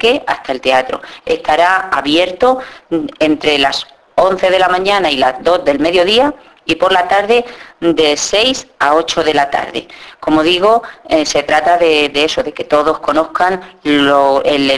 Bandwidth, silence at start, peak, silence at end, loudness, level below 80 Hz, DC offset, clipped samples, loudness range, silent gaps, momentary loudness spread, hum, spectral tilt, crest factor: 11 kHz; 0 s; 0 dBFS; 0 s; -12 LUFS; -44 dBFS; under 0.1%; under 0.1%; 2 LU; none; 9 LU; none; -3 dB/octave; 12 dB